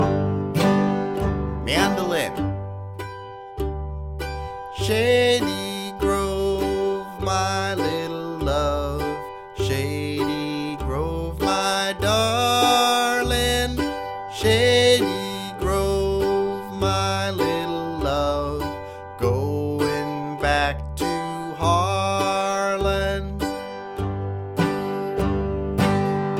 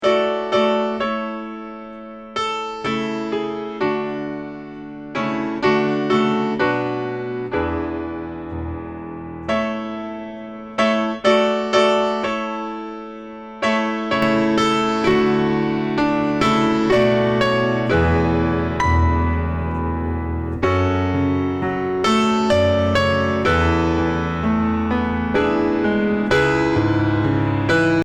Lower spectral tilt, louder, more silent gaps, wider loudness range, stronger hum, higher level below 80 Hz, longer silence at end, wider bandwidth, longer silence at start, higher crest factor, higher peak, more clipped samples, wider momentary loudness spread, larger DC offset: second, -5 dB/octave vs -6.5 dB/octave; second, -23 LUFS vs -19 LUFS; neither; about the same, 5 LU vs 7 LU; neither; about the same, -36 dBFS vs -36 dBFS; about the same, 0 s vs 0 s; first, 16.5 kHz vs 10 kHz; about the same, 0 s vs 0 s; about the same, 18 dB vs 16 dB; second, -6 dBFS vs -2 dBFS; neither; about the same, 11 LU vs 13 LU; neither